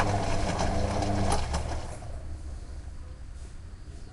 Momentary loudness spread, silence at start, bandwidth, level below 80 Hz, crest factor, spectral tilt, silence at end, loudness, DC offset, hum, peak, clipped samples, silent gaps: 17 LU; 0 s; 11.5 kHz; -36 dBFS; 20 dB; -5.5 dB/octave; 0 s; -31 LUFS; under 0.1%; none; -10 dBFS; under 0.1%; none